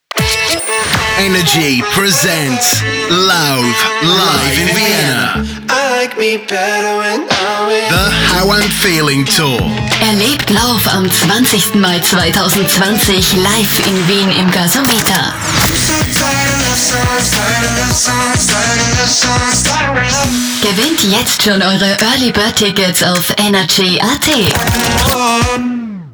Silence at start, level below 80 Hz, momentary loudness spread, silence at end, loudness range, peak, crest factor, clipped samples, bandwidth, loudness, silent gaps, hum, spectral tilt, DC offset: 0.15 s; -30 dBFS; 4 LU; 0 s; 2 LU; 0 dBFS; 12 dB; under 0.1%; over 20 kHz; -10 LUFS; none; none; -3 dB/octave; under 0.1%